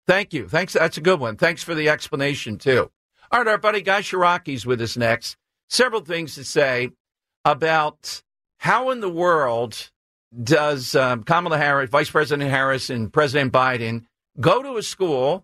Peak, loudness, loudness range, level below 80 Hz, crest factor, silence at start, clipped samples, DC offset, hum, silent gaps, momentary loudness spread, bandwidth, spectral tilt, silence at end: -4 dBFS; -20 LUFS; 3 LU; -58 dBFS; 16 dB; 0.1 s; under 0.1%; under 0.1%; none; 2.96-3.10 s, 5.63-5.68 s, 7.00-7.05 s, 7.36-7.44 s, 9.96-10.31 s; 8 LU; 14 kHz; -4.5 dB/octave; 0.05 s